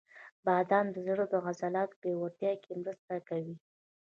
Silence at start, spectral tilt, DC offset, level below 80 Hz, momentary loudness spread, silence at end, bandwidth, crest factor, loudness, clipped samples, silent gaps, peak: 0.15 s; -7.5 dB/octave; under 0.1%; -82 dBFS; 11 LU; 0.6 s; 7.2 kHz; 20 dB; -34 LUFS; under 0.1%; 0.32-0.43 s, 1.96-2.02 s, 2.99-3.08 s; -14 dBFS